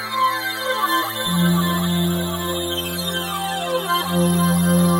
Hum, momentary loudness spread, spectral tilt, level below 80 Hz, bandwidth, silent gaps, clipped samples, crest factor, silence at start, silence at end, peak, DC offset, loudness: none; 6 LU; -4.5 dB/octave; -48 dBFS; 19 kHz; none; under 0.1%; 12 dB; 0 s; 0 s; -6 dBFS; under 0.1%; -20 LUFS